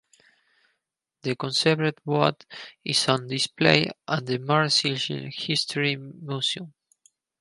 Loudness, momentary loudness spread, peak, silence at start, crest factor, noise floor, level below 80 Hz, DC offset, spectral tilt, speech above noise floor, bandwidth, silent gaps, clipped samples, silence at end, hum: -24 LUFS; 14 LU; -2 dBFS; 1.25 s; 26 dB; -81 dBFS; -68 dBFS; under 0.1%; -4 dB/octave; 56 dB; 11.5 kHz; none; under 0.1%; 0.7 s; none